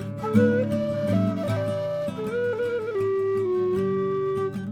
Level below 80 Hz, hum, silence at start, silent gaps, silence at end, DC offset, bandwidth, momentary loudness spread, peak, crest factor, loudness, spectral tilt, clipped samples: -58 dBFS; none; 0 s; none; 0 s; under 0.1%; 13.5 kHz; 6 LU; -8 dBFS; 18 dB; -25 LUFS; -8 dB/octave; under 0.1%